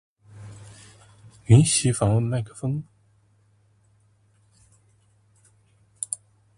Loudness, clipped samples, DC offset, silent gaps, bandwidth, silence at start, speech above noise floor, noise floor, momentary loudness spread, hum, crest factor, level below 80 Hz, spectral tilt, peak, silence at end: -22 LUFS; under 0.1%; under 0.1%; none; 11.5 kHz; 0.35 s; 42 dB; -62 dBFS; 28 LU; none; 22 dB; -52 dBFS; -5.5 dB/octave; -4 dBFS; 0.4 s